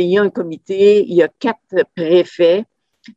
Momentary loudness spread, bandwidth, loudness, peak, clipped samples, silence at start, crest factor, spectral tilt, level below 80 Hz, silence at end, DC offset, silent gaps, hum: 9 LU; 7.8 kHz; -15 LUFS; -2 dBFS; under 0.1%; 0 s; 14 dB; -7 dB/octave; -66 dBFS; 0.05 s; under 0.1%; none; none